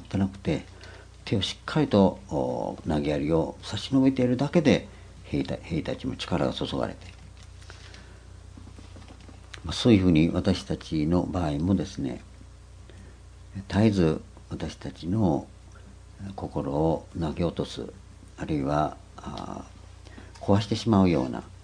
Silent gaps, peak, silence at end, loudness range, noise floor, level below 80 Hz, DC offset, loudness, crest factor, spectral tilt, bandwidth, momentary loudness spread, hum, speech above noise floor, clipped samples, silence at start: none; -6 dBFS; 0.1 s; 7 LU; -47 dBFS; -46 dBFS; under 0.1%; -26 LUFS; 22 dB; -7 dB/octave; 10.5 kHz; 24 LU; none; 21 dB; under 0.1%; 0 s